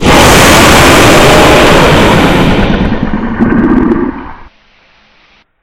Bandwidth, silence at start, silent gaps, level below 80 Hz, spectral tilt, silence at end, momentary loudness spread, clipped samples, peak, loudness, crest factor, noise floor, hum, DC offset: over 20 kHz; 0 s; none; -18 dBFS; -4.5 dB/octave; 1.2 s; 11 LU; 7%; 0 dBFS; -5 LUFS; 6 dB; -46 dBFS; none; under 0.1%